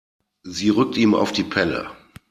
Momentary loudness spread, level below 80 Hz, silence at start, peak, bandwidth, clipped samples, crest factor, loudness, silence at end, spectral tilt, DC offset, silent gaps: 13 LU; -54 dBFS; 0.45 s; -2 dBFS; 14 kHz; under 0.1%; 20 dB; -20 LUFS; 0.35 s; -5 dB/octave; under 0.1%; none